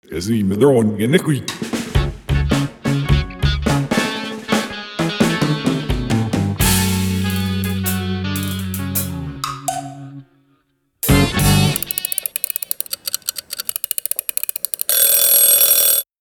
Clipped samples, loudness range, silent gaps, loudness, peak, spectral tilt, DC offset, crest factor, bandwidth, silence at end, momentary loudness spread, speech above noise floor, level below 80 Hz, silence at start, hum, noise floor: under 0.1%; 6 LU; none; -17 LUFS; 0 dBFS; -4 dB/octave; under 0.1%; 18 dB; over 20 kHz; 0.15 s; 13 LU; 47 dB; -30 dBFS; 0.1 s; none; -63 dBFS